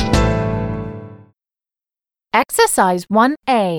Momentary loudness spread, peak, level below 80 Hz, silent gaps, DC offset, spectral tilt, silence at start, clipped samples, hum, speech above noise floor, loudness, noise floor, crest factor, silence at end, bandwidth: 13 LU; -2 dBFS; -30 dBFS; none; under 0.1%; -5 dB/octave; 0 s; under 0.1%; none; over 75 dB; -16 LUFS; under -90 dBFS; 16 dB; 0 s; 19.5 kHz